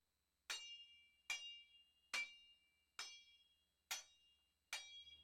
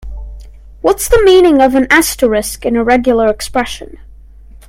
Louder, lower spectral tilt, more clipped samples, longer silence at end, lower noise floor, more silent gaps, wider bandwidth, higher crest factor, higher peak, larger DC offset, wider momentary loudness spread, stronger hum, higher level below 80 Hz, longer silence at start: second, -51 LUFS vs -11 LUFS; second, 3 dB/octave vs -3.5 dB/octave; neither; second, 0 s vs 0.7 s; first, -81 dBFS vs -36 dBFS; neither; about the same, 16 kHz vs 17 kHz; first, 24 dB vs 12 dB; second, -32 dBFS vs 0 dBFS; neither; first, 18 LU vs 13 LU; first, 60 Hz at -95 dBFS vs none; second, under -90 dBFS vs -28 dBFS; first, 0.5 s vs 0.05 s